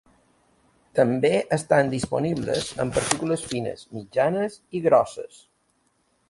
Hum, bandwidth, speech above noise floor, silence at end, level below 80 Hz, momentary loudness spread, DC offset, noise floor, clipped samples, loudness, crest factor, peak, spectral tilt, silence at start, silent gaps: none; 11.5 kHz; 45 dB; 1.05 s; -54 dBFS; 10 LU; under 0.1%; -68 dBFS; under 0.1%; -24 LUFS; 22 dB; -4 dBFS; -5 dB/octave; 0.95 s; none